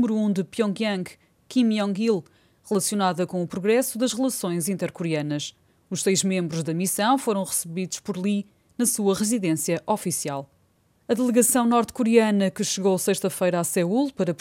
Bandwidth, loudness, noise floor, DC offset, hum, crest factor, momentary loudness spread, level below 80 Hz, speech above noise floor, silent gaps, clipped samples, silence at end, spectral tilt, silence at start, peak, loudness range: 17 kHz; -24 LUFS; -64 dBFS; under 0.1%; none; 20 dB; 8 LU; -68 dBFS; 41 dB; none; under 0.1%; 0.05 s; -4.5 dB/octave; 0 s; -4 dBFS; 4 LU